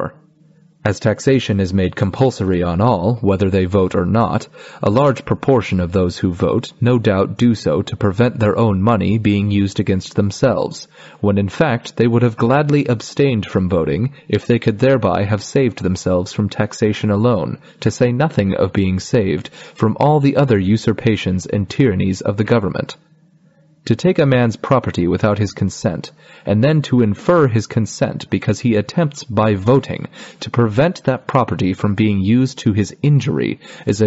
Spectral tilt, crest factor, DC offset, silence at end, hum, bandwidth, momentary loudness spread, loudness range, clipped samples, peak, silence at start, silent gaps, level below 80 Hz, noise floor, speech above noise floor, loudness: -7 dB/octave; 14 dB; under 0.1%; 0 s; none; 8 kHz; 7 LU; 2 LU; under 0.1%; -2 dBFS; 0 s; none; -46 dBFS; -52 dBFS; 36 dB; -16 LUFS